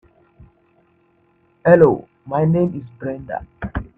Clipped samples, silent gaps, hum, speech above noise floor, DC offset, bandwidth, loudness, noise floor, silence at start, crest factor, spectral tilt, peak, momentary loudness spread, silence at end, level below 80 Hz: under 0.1%; none; none; 43 dB; under 0.1%; 3.8 kHz; -18 LUFS; -59 dBFS; 1.65 s; 20 dB; -11 dB/octave; 0 dBFS; 17 LU; 0.15 s; -44 dBFS